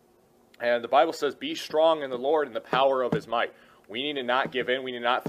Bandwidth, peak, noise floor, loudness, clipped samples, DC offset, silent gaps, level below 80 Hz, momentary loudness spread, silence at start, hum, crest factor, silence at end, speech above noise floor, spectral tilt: 15 kHz; -8 dBFS; -61 dBFS; -26 LUFS; under 0.1%; under 0.1%; none; -70 dBFS; 8 LU; 0.6 s; none; 18 dB; 0 s; 35 dB; -4.5 dB/octave